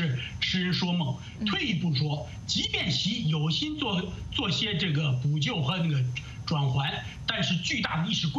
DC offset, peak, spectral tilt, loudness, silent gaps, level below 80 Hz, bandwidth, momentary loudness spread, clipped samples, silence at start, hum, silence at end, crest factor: under 0.1%; -10 dBFS; -5 dB/octave; -28 LUFS; none; -50 dBFS; 8 kHz; 5 LU; under 0.1%; 0 s; none; 0 s; 18 dB